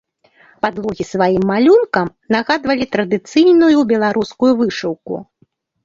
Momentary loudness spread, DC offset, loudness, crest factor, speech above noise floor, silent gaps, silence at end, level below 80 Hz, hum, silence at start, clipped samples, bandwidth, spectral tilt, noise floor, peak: 12 LU; under 0.1%; -15 LUFS; 14 dB; 44 dB; none; 0.6 s; -52 dBFS; none; 0.65 s; under 0.1%; 7.6 kHz; -6 dB/octave; -59 dBFS; -2 dBFS